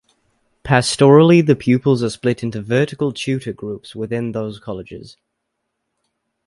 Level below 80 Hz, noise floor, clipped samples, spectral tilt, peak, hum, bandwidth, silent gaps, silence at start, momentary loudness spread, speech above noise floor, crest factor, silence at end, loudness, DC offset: -52 dBFS; -75 dBFS; under 0.1%; -6 dB/octave; 0 dBFS; none; 11.5 kHz; none; 0.65 s; 19 LU; 59 dB; 18 dB; 1.35 s; -16 LUFS; under 0.1%